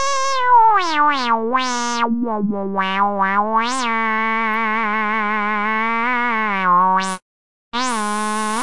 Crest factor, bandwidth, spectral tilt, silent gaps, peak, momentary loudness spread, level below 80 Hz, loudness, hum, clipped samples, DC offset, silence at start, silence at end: 14 dB; 11.5 kHz; -3 dB/octave; 7.22-7.72 s; -4 dBFS; 7 LU; -60 dBFS; -18 LUFS; none; under 0.1%; 3%; 0 s; 0 s